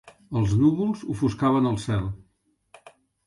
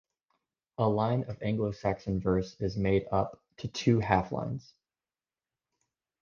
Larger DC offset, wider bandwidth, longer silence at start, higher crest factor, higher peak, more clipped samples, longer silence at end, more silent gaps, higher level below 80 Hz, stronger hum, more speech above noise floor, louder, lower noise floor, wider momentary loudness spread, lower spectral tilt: neither; first, 11.5 kHz vs 7.2 kHz; second, 0.05 s vs 0.8 s; second, 16 dB vs 24 dB; about the same, -10 dBFS vs -8 dBFS; neither; second, 1.1 s vs 1.6 s; neither; first, -46 dBFS vs -52 dBFS; neither; second, 46 dB vs over 61 dB; first, -24 LUFS vs -30 LUFS; second, -69 dBFS vs under -90 dBFS; about the same, 10 LU vs 11 LU; about the same, -8 dB/octave vs -7.5 dB/octave